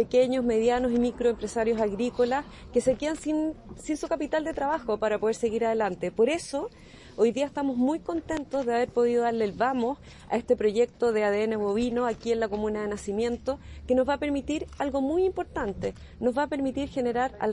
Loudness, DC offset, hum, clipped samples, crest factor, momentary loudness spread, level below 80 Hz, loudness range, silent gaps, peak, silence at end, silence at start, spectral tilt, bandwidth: -27 LUFS; under 0.1%; none; under 0.1%; 16 dB; 7 LU; -50 dBFS; 2 LU; none; -12 dBFS; 0 s; 0 s; -5.5 dB/octave; 11 kHz